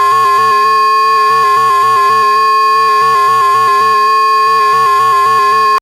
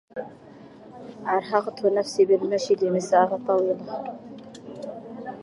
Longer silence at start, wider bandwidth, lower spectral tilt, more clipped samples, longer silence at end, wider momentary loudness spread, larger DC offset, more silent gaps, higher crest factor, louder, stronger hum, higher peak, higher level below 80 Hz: second, 0 s vs 0.15 s; first, 15.5 kHz vs 11.5 kHz; second, -1.5 dB/octave vs -5.5 dB/octave; neither; about the same, 0 s vs 0 s; second, 0 LU vs 21 LU; neither; neither; second, 6 dB vs 18 dB; first, -8 LUFS vs -23 LUFS; neither; about the same, -4 dBFS vs -6 dBFS; first, -56 dBFS vs -70 dBFS